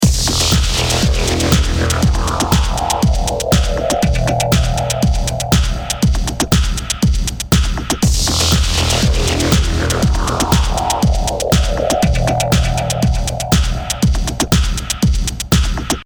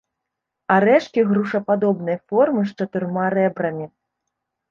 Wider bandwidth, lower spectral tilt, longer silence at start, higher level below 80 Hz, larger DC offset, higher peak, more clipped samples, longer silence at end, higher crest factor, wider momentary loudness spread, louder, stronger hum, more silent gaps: first, over 20 kHz vs 7 kHz; second, -4.5 dB/octave vs -8 dB/octave; second, 0 s vs 0.7 s; first, -18 dBFS vs -66 dBFS; neither; about the same, 0 dBFS vs -2 dBFS; neither; second, 0 s vs 0.85 s; about the same, 14 dB vs 18 dB; second, 3 LU vs 10 LU; first, -15 LUFS vs -20 LUFS; neither; neither